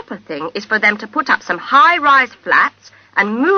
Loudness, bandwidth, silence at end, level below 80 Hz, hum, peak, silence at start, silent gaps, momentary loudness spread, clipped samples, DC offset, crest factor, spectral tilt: -13 LUFS; 6.6 kHz; 0 s; -60 dBFS; none; 0 dBFS; 0.1 s; none; 14 LU; under 0.1%; under 0.1%; 14 dB; -4 dB/octave